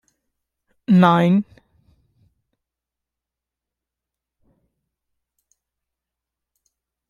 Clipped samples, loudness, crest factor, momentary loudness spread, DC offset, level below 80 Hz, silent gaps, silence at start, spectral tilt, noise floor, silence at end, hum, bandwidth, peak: under 0.1%; -16 LUFS; 22 dB; 22 LU; under 0.1%; -66 dBFS; none; 0.9 s; -8.5 dB/octave; -87 dBFS; 5.65 s; none; 6.8 kHz; -2 dBFS